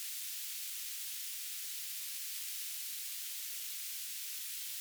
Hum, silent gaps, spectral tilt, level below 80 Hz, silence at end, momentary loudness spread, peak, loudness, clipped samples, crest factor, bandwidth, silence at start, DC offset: none; none; 10 dB/octave; under -90 dBFS; 0 s; 1 LU; -26 dBFS; -39 LUFS; under 0.1%; 16 dB; over 20 kHz; 0 s; under 0.1%